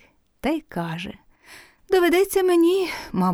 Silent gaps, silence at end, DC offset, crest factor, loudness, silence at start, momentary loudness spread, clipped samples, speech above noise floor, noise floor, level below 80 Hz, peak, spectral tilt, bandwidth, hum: none; 0 s; under 0.1%; 14 dB; -21 LUFS; 0.45 s; 12 LU; under 0.1%; 28 dB; -49 dBFS; -52 dBFS; -8 dBFS; -5.5 dB/octave; 19.5 kHz; none